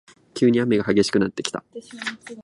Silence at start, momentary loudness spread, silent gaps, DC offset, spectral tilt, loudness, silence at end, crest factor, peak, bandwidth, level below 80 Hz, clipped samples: 0.35 s; 15 LU; none; under 0.1%; -5 dB/octave; -22 LUFS; 0 s; 20 dB; -2 dBFS; 11.5 kHz; -56 dBFS; under 0.1%